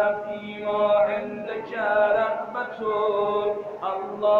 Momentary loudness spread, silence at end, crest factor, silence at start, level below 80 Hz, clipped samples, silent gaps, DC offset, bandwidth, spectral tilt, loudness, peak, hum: 10 LU; 0 s; 14 dB; 0 s; -64 dBFS; under 0.1%; none; under 0.1%; 4.8 kHz; -6.5 dB/octave; -25 LUFS; -10 dBFS; none